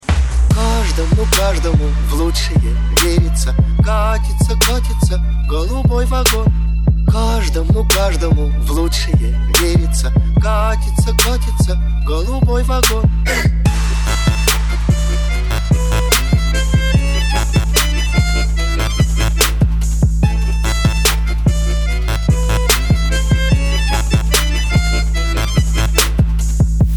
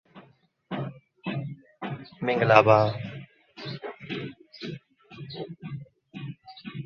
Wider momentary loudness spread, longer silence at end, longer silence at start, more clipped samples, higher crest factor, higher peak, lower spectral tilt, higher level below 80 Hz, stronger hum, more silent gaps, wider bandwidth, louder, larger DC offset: second, 4 LU vs 23 LU; about the same, 0 s vs 0 s; about the same, 0.05 s vs 0.15 s; neither; second, 14 dB vs 28 dB; about the same, 0 dBFS vs -2 dBFS; second, -4.5 dB/octave vs -7.5 dB/octave; first, -16 dBFS vs -64 dBFS; neither; neither; first, 20 kHz vs 6.8 kHz; first, -15 LUFS vs -26 LUFS; neither